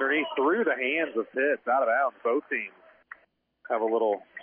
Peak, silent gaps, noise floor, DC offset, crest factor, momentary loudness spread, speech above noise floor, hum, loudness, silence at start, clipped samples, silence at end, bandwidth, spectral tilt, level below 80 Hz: -14 dBFS; none; -66 dBFS; under 0.1%; 14 dB; 7 LU; 39 dB; none; -27 LUFS; 0 s; under 0.1%; 0 s; 3.6 kHz; -7.5 dB/octave; -86 dBFS